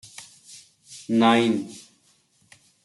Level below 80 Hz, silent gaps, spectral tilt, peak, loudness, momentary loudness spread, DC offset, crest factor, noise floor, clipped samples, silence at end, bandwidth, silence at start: -74 dBFS; none; -5 dB/octave; -6 dBFS; -21 LUFS; 27 LU; under 0.1%; 20 dB; -63 dBFS; under 0.1%; 1.05 s; 12 kHz; 0.2 s